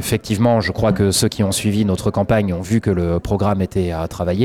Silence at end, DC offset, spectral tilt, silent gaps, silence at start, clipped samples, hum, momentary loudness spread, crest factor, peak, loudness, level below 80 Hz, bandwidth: 0 s; under 0.1%; -5.5 dB/octave; none; 0 s; under 0.1%; none; 5 LU; 12 dB; -6 dBFS; -18 LUFS; -36 dBFS; 17 kHz